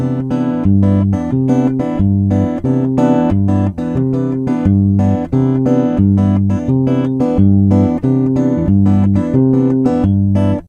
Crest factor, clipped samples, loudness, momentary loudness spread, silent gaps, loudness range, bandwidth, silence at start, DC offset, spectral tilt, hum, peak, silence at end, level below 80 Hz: 12 dB; under 0.1%; -13 LUFS; 4 LU; none; 2 LU; 7 kHz; 0 s; under 0.1%; -10.5 dB/octave; none; 0 dBFS; 0.05 s; -36 dBFS